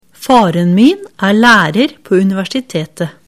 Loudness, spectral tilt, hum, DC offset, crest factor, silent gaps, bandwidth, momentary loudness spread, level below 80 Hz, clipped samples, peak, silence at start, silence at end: -11 LUFS; -5.5 dB/octave; none; under 0.1%; 12 dB; none; 15.5 kHz; 11 LU; -48 dBFS; under 0.1%; 0 dBFS; 0.2 s; 0.15 s